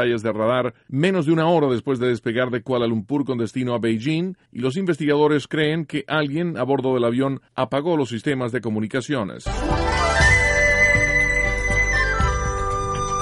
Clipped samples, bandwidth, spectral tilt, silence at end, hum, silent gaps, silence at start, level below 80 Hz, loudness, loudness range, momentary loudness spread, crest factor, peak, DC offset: under 0.1%; 11.5 kHz; -5.5 dB/octave; 0 s; none; none; 0 s; -32 dBFS; -20 LUFS; 5 LU; 10 LU; 16 dB; -4 dBFS; under 0.1%